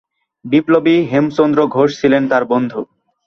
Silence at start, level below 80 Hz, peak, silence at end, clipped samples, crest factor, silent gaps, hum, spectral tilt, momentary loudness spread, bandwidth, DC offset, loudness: 0.45 s; -54 dBFS; -2 dBFS; 0.4 s; under 0.1%; 14 dB; none; none; -7 dB/octave; 7 LU; 6.8 kHz; under 0.1%; -14 LUFS